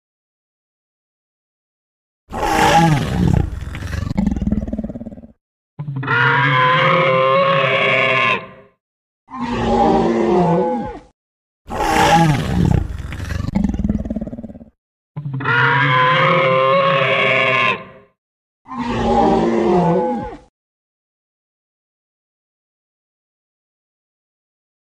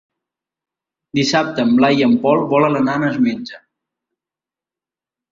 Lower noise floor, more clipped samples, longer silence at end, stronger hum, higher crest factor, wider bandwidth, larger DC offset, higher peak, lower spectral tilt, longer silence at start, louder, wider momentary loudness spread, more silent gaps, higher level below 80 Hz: about the same, under -90 dBFS vs -89 dBFS; neither; first, 4.45 s vs 1.75 s; neither; about the same, 18 dB vs 18 dB; first, 15.5 kHz vs 7.6 kHz; neither; about the same, 0 dBFS vs -2 dBFS; about the same, -6 dB/octave vs -5.5 dB/octave; first, 2.3 s vs 1.15 s; about the same, -16 LUFS vs -16 LUFS; first, 15 LU vs 8 LU; first, 5.41-5.77 s, 8.80-9.27 s, 11.13-11.65 s, 14.78-15.15 s, 18.18-18.65 s vs none; first, -34 dBFS vs -58 dBFS